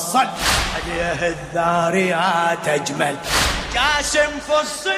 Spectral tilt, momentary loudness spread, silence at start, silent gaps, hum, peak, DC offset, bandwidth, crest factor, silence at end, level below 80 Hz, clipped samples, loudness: -3 dB/octave; 5 LU; 0 s; none; none; -4 dBFS; under 0.1%; 15.5 kHz; 16 dB; 0 s; -36 dBFS; under 0.1%; -19 LUFS